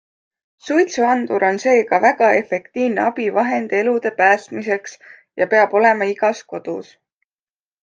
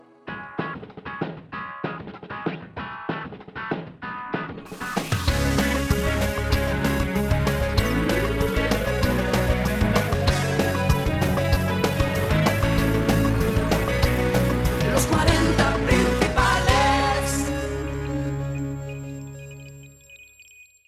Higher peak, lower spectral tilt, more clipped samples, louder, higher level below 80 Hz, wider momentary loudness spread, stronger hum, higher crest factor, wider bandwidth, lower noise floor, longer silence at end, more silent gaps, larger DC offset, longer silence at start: about the same, -2 dBFS vs -4 dBFS; about the same, -4.5 dB/octave vs -5.5 dB/octave; neither; first, -17 LUFS vs -23 LUFS; second, -72 dBFS vs -30 dBFS; about the same, 13 LU vs 14 LU; neither; about the same, 16 dB vs 18 dB; second, 9.2 kHz vs 16.5 kHz; first, under -90 dBFS vs -51 dBFS; first, 1 s vs 0.25 s; neither; neither; first, 0.65 s vs 0.25 s